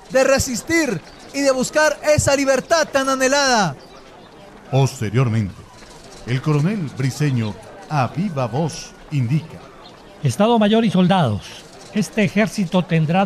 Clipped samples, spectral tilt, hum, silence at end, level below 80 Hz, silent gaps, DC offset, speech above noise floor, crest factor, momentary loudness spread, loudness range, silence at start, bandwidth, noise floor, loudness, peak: under 0.1%; -5 dB/octave; none; 0 s; -44 dBFS; none; under 0.1%; 24 dB; 14 dB; 13 LU; 5 LU; 0.1 s; 14.5 kHz; -42 dBFS; -19 LUFS; -4 dBFS